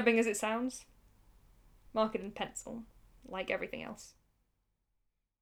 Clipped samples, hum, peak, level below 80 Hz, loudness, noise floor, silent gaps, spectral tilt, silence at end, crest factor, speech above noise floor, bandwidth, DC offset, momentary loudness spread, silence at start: under 0.1%; none; -16 dBFS; -64 dBFS; -36 LUFS; -81 dBFS; none; -3.5 dB/octave; 1.3 s; 22 dB; 46 dB; 16.5 kHz; under 0.1%; 18 LU; 0 s